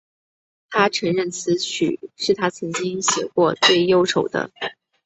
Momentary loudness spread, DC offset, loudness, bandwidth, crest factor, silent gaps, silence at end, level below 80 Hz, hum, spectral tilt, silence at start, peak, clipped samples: 10 LU; under 0.1%; -20 LUFS; 8.2 kHz; 20 dB; none; 0.35 s; -64 dBFS; none; -3.5 dB/octave; 0.7 s; -2 dBFS; under 0.1%